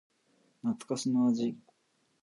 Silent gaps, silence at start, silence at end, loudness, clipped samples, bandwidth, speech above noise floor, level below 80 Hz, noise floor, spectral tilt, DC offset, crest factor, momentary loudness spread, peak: none; 0.65 s; 0.65 s; -32 LUFS; under 0.1%; 11.5 kHz; 44 dB; -82 dBFS; -74 dBFS; -6 dB/octave; under 0.1%; 14 dB; 9 LU; -18 dBFS